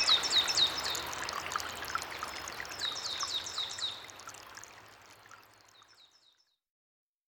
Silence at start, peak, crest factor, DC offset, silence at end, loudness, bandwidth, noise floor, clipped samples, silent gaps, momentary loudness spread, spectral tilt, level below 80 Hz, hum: 0 s; -16 dBFS; 22 dB; under 0.1%; 1.2 s; -32 LUFS; 19 kHz; -70 dBFS; under 0.1%; none; 22 LU; 0.5 dB/octave; -66 dBFS; none